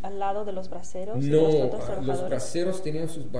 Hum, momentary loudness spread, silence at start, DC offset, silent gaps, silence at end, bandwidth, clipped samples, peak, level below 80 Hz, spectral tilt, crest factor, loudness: none; 14 LU; 0 s; 5%; none; 0 s; 11 kHz; under 0.1%; -8 dBFS; -54 dBFS; -6.5 dB/octave; 18 dB; -27 LUFS